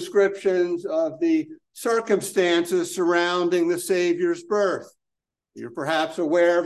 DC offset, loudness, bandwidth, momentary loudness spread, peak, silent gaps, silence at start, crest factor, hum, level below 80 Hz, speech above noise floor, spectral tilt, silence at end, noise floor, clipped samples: under 0.1%; -23 LUFS; 12.5 kHz; 6 LU; -6 dBFS; none; 0 s; 16 dB; none; -76 dBFS; 63 dB; -4 dB/octave; 0 s; -85 dBFS; under 0.1%